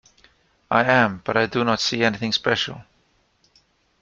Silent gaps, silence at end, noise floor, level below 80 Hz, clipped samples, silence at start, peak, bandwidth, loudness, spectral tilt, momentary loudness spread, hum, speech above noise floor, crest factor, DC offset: none; 1.2 s; -64 dBFS; -58 dBFS; under 0.1%; 0.7 s; -2 dBFS; 7.4 kHz; -20 LUFS; -4.5 dB/octave; 6 LU; none; 43 dB; 22 dB; under 0.1%